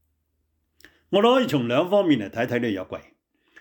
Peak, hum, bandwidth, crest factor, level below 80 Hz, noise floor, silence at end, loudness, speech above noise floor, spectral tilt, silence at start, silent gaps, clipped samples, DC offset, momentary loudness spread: -8 dBFS; none; 19.5 kHz; 16 dB; -68 dBFS; -72 dBFS; 0.6 s; -22 LUFS; 51 dB; -6.5 dB/octave; 1.1 s; none; under 0.1%; under 0.1%; 12 LU